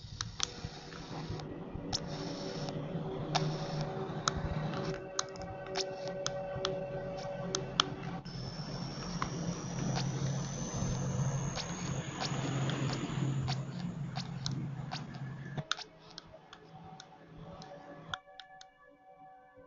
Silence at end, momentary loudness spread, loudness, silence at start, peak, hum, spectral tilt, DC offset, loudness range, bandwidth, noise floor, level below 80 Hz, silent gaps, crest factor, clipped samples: 0 s; 16 LU; -38 LUFS; 0 s; -4 dBFS; none; -4.5 dB/octave; under 0.1%; 8 LU; 7.6 kHz; -60 dBFS; -54 dBFS; none; 34 dB; under 0.1%